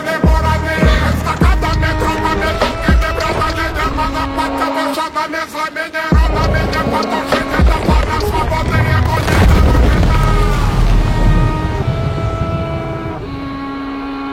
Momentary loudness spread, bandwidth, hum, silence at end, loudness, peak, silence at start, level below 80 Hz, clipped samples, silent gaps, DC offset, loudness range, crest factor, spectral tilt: 7 LU; 16 kHz; none; 0 s; -15 LUFS; 0 dBFS; 0 s; -18 dBFS; under 0.1%; none; under 0.1%; 4 LU; 14 dB; -6 dB/octave